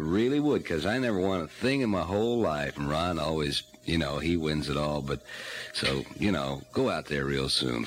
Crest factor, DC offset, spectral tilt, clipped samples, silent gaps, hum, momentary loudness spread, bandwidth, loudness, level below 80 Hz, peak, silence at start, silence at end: 16 dB; under 0.1%; -5.5 dB/octave; under 0.1%; none; none; 5 LU; 16 kHz; -29 LUFS; -48 dBFS; -14 dBFS; 0 s; 0 s